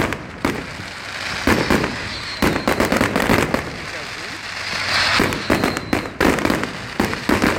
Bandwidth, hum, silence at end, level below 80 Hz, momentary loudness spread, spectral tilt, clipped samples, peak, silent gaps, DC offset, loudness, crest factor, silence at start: 17 kHz; none; 0 s; -36 dBFS; 11 LU; -4 dB/octave; under 0.1%; 0 dBFS; none; under 0.1%; -20 LUFS; 20 dB; 0 s